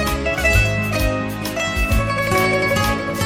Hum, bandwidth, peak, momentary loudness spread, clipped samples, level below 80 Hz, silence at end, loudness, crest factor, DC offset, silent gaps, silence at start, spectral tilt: none; 17 kHz; -2 dBFS; 6 LU; under 0.1%; -26 dBFS; 0 s; -18 LUFS; 16 dB; under 0.1%; none; 0 s; -4.5 dB/octave